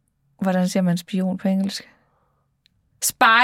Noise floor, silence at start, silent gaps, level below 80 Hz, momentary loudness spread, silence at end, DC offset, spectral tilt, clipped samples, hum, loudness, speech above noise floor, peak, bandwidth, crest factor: -67 dBFS; 0.4 s; none; -66 dBFS; 10 LU; 0 s; under 0.1%; -4 dB/octave; under 0.1%; none; -21 LUFS; 47 dB; -2 dBFS; 16.5 kHz; 20 dB